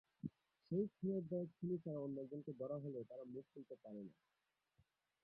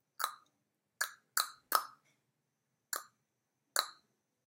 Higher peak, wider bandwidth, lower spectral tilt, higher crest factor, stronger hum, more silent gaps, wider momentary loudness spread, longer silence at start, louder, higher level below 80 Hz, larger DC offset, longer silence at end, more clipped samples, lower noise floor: second, -30 dBFS vs -8 dBFS; second, 5.2 kHz vs 17 kHz; first, -12 dB/octave vs 3 dB/octave; second, 18 dB vs 34 dB; neither; neither; first, 12 LU vs 8 LU; about the same, 0.25 s vs 0.2 s; second, -48 LUFS vs -38 LUFS; first, -84 dBFS vs under -90 dBFS; neither; first, 1.1 s vs 0.55 s; neither; about the same, -81 dBFS vs -84 dBFS